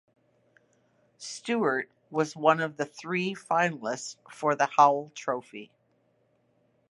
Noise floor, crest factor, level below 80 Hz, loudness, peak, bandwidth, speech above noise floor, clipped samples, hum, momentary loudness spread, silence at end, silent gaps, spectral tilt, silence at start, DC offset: -70 dBFS; 24 dB; -82 dBFS; -28 LUFS; -6 dBFS; 11.5 kHz; 42 dB; under 0.1%; none; 17 LU; 1.25 s; none; -4.5 dB/octave; 1.2 s; under 0.1%